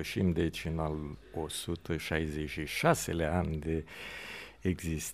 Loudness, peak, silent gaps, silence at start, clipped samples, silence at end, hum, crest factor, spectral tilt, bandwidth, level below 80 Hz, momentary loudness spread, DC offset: -34 LUFS; -12 dBFS; none; 0 s; under 0.1%; 0 s; none; 22 dB; -5 dB/octave; 15.5 kHz; -46 dBFS; 12 LU; under 0.1%